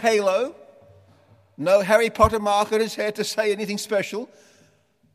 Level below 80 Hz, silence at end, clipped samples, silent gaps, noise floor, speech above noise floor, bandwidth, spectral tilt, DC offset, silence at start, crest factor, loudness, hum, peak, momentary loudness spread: -46 dBFS; 0.9 s; under 0.1%; none; -61 dBFS; 40 dB; 15.5 kHz; -4 dB/octave; under 0.1%; 0 s; 20 dB; -22 LUFS; none; -2 dBFS; 12 LU